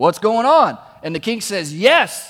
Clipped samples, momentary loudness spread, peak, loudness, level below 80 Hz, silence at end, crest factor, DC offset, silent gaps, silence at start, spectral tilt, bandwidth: under 0.1%; 12 LU; 0 dBFS; -16 LUFS; -62 dBFS; 0 s; 16 dB; under 0.1%; none; 0 s; -3.5 dB/octave; 16.5 kHz